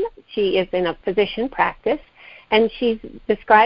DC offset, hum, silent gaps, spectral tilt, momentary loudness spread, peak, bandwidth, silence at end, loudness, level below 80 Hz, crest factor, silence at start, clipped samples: under 0.1%; none; none; -8.5 dB/octave; 7 LU; 0 dBFS; 5.6 kHz; 0 s; -21 LUFS; -50 dBFS; 20 dB; 0 s; under 0.1%